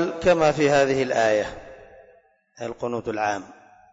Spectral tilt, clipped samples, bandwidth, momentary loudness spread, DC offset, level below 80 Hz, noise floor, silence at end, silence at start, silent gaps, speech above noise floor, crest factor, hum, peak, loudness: -5 dB/octave; under 0.1%; 8 kHz; 15 LU; under 0.1%; -52 dBFS; -57 dBFS; 0.4 s; 0 s; none; 35 dB; 14 dB; none; -10 dBFS; -22 LUFS